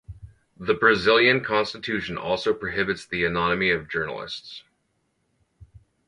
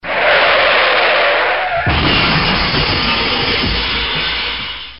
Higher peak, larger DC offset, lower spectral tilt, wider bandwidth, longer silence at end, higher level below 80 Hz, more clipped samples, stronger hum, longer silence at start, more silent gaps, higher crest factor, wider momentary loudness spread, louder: second, -4 dBFS vs 0 dBFS; second, under 0.1% vs 0.9%; first, -5 dB/octave vs -1 dB/octave; first, 10.5 kHz vs 5.8 kHz; first, 0.45 s vs 0 s; second, -52 dBFS vs -30 dBFS; neither; neither; about the same, 0.1 s vs 0.05 s; neither; first, 22 dB vs 14 dB; first, 16 LU vs 6 LU; second, -23 LUFS vs -12 LUFS